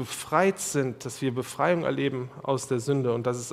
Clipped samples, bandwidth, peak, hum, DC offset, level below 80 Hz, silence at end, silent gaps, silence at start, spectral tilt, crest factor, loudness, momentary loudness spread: under 0.1%; 16 kHz; -8 dBFS; none; under 0.1%; -66 dBFS; 0 s; none; 0 s; -5 dB/octave; 20 dB; -27 LUFS; 6 LU